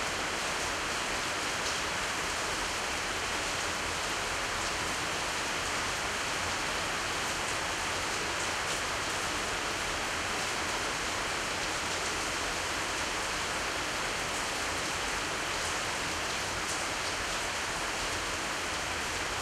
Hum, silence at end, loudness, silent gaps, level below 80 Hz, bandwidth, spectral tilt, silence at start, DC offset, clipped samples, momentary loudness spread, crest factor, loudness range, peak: none; 0 s; -31 LUFS; none; -50 dBFS; 16 kHz; -1.5 dB/octave; 0 s; under 0.1%; under 0.1%; 1 LU; 14 dB; 0 LU; -20 dBFS